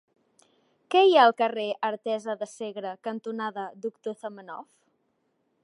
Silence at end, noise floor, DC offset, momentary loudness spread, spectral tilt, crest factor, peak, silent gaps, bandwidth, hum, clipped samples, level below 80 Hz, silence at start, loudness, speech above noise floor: 1 s; -73 dBFS; under 0.1%; 19 LU; -4 dB/octave; 20 dB; -6 dBFS; none; 11.5 kHz; none; under 0.1%; -88 dBFS; 0.9 s; -26 LUFS; 48 dB